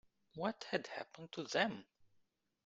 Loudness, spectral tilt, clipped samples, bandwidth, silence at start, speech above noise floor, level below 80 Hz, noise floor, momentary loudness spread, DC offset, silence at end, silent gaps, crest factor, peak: -41 LUFS; -4 dB/octave; under 0.1%; 9 kHz; 0.35 s; 37 dB; -82 dBFS; -78 dBFS; 13 LU; under 0.1%; 0.6 s; none; 26 dB; -18 dBFS